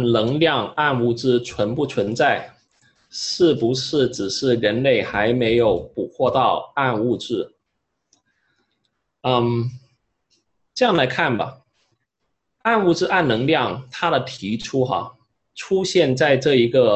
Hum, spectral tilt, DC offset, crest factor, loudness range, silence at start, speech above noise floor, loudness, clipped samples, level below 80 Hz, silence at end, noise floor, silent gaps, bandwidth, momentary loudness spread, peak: none; -5.5 dB/octave; under 0.1%; 18 dB; 5 LU; 0 s; 57 dB; -20 LUFS; under 0.1%; -52 dBFS; 0 s; -76 dBFS; none; 8.6 kHz; 10 LU; -2 dBFS